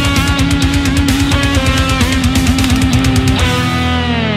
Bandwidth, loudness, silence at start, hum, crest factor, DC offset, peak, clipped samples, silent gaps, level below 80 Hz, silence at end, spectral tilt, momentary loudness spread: 16 kHz; -12 LUFS; 0 s; none; 12 dB; under 0.1%; 0 dBFS; under 0.1%; none; -20 dBFS; 0 s; -5 dB/octave; 2 LU